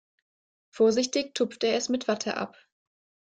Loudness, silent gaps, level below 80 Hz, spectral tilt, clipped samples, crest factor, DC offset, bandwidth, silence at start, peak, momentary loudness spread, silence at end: -27 LUFS; none; -72 dBFS; -3 dB/octave; under 0.1%; 16 dB; under 0.1%; 9.4 kHz; 0.75 s; -12 dBFS; 9 LU; 0.85 s